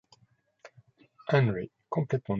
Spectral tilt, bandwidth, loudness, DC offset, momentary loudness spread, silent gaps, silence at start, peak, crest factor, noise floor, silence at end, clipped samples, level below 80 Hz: -8.5 dB/octave; 7.2 kHz; -29 LUFS; under 0.1%; 11 LU; none; 0.65 s; -12 dBFS; 20 dB; -68 dBFS; 0 s; under 0.1%; -62 dBFS